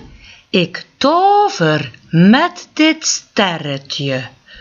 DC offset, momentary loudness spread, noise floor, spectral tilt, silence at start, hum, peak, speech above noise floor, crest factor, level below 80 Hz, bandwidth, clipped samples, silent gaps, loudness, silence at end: under 0.1%; 11 LU; -41 dBFS; -4.5 dB/octave; 0.55 s; none; 0 dBFS; 26 dB; 14 dB; -52 dBFS; 7.6 kHz; under 0.1%; none; -14 LUFS; 0.3 s